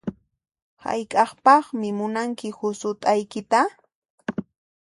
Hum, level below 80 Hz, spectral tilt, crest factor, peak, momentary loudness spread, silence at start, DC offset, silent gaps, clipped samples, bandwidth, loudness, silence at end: none; -66 dBFS; -5 dB/octave; 20 dB; -4 dBFS; 16 LU; 0.05 s; under 0.1%; 0.62-0.77 s, 3.95-4.02 s, 4.10-4.18 s; under 0.1%; 11.5 kHz; -23 LUFS; 0.45 s